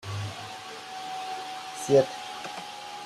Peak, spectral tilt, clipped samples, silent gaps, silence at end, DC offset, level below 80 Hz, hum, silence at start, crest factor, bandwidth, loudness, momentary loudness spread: -8 dBFS; -4.5 dB/octave; under 0.1%; none; 0 s; under 0.1%; -68 dBFS; none; 0 s; 22 dB; 14.5 kHz; -31 LUFS; 16 LU